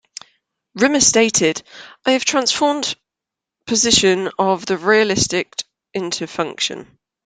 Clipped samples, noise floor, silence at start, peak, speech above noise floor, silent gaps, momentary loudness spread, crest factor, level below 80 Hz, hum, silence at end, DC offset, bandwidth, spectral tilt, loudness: under 0.1%; -85 dBFS; 0.75 s; 0 dBFS; 68 dB; none; 17 LU; 18 dB; -52 dBFS; none; 0.4 s; under 0.1%; 10.5 kHz; -2 dB/octave; -17 LUFS